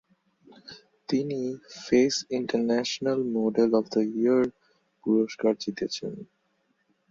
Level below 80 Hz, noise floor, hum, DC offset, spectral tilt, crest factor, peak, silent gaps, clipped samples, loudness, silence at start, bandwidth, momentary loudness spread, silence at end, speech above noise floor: -68 dBFS; -72 dBFS; none; under 0.1%; -5 dB/octave; 18 dB; -10 dBFS; none; under 0.1%; -26 LUFS; 0.65 s; 7.6 kHz; 15 LU; 0.85 s; 46 dB